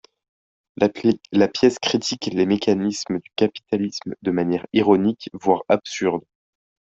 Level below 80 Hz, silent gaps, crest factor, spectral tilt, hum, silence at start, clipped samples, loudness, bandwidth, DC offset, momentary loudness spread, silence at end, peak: -62 dBFS; none; 20 dB; -5 dB/octave; none; 0.8 s; under 0.1%; -21 LUFS; 8 kHz; under 0.1%; 7 LU; 0.75 s; -2 dBFS